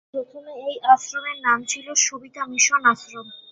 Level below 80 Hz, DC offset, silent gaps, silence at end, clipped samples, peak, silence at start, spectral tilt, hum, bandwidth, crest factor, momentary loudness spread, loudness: -74 dBFS; under 0.1%; none; 0.15 s; under 0.1%; -2 dBFS; 0.15 s; 0.5 dB/octave; none; 8.2 kHz; 20 dB; 16 LU; -20 LUFS